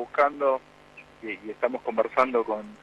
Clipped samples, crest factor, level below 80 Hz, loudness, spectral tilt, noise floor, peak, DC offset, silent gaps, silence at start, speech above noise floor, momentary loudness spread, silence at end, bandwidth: under 0.1%; 20 dB; -68 dBFS; -27 LUFS; -5.5 dB/octave; -51 dBFS; -8 dBFS; under 0.1%; none; 0 s; 25 dB; 13 LU; 0.05 s; 9.2 kHz